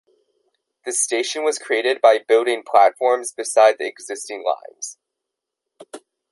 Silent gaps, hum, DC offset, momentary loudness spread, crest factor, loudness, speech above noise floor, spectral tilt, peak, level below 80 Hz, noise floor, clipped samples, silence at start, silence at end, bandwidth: none; none; under 0.1%; 15 LU; 18 dB; -19 LUFS; 64 dB; 0.5 dB/octave; -2 dBFS; -76 dBFS; -83 dBFS; under 0.1%; 0.85 s; 0.35 s; 12 kHz